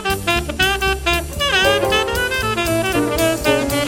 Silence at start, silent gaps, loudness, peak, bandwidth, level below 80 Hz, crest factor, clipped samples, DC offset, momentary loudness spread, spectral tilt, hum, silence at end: 0 s; none; -17 LUFS; -2 dBFS; 17 kHz; -30 dBFS; 16 dB; under 0.1%; under 0.1%; 4 LU; -3.5 dB/octave; none; 0 s